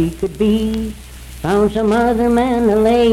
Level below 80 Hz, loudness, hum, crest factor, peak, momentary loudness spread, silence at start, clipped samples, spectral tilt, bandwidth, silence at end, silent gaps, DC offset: -32 dBFS; -15 LUFS; none; 12 dB; -4 dBFS; 13 LU; 0 s; under 0.1%; -6.5 dB/octave; 15 kHz; 0 s; none; under 0.1%